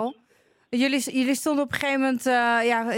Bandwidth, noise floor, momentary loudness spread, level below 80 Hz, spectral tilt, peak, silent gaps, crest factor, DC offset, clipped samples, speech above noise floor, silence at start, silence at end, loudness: 17 kHz; -63 dBFS; 4 LU; -68 dBFS; -3 dB/octave; -6 dBFS; none; 18 dB; under 0.1%; under 0.1%; 40 dB; 0 s; 0 s; -23 LUFS